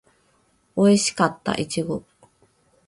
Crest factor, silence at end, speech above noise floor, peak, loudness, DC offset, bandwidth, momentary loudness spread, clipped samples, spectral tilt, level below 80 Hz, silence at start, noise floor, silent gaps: 20 dB; 0.9 s; 43 dB; -4 dBFS; -22 LUFS; under 0.1%; 11.5 kHz; 13 LU; under 0.1%; -4.5 dB/octave; -58 dBFS; 0.75 s; -63 dBFS; none